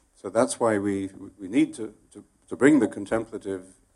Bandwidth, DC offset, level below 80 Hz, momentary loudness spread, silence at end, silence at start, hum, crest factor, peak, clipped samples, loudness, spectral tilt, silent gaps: 12 kHz; under 0.1%; -62 dBFS; 18 LU; 0.3 s; 0.25 s; none; 20 dB; -6 dBFS; under 0.1%; -25 LUFS; -5.5 dB/octave; none